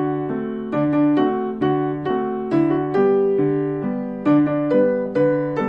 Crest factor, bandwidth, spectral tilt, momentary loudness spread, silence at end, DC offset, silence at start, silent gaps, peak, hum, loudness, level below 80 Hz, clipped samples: 12 dB; 5.4 kHz; -10 dB/octave; 7 LU; 0 s; under 0.1%; 0 s; none; -6 dBFS; none; -20 LUFS; -54 dBFS; under 0.1%